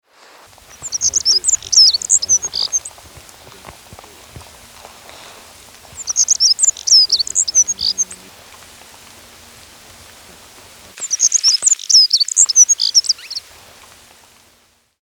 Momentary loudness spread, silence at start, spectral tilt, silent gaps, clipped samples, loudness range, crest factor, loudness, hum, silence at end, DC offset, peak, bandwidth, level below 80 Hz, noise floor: 13 LU; 0.8 s; 3 dB/octave; none; under 0.1%; 13 LU; 18 dB; -11 LUFS; none; 1.65 s; under 0.1%; 0 dBFS; over 20 kHz; -54 dBFS; -55 dBFS